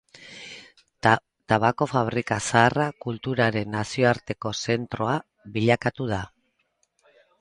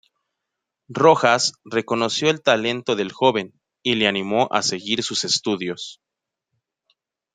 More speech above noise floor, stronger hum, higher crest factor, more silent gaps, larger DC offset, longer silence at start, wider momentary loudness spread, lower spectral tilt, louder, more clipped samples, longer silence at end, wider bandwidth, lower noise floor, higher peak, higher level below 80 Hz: second, 48 dB vs 62 dB; neither; about the same, 22 dB vs 22 dB; neither; neither; second, 0.2 s vs 0.9 s; first, 18 LU vs 11 LU; first, -5.5 dB/octave vs -3 dB/octave; second, -24 LUFS vs -20 LUFS; neither; second, 1.15 s vs 1.4 s; first, 11 kHz vs 9.6 kHz; second, -71 dBFS vs -82 dBFS; about the same, -2 dBFS vs 0 dBFS; first, -54 dBFS vs -66 dBFS